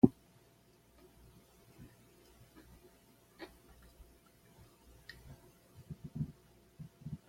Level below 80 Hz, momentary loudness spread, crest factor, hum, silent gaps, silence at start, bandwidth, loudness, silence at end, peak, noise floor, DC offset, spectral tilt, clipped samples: -64 dBFS; 20 LU; 34 dB; 60 Hz at -70 dBFS; none; 0.05 s; 16.5 kHz; -43 LUFS; 0.1 s; -8 dBFS; -66 dBFS; under 0.1%; -8.5 dB/octave; under 0.1%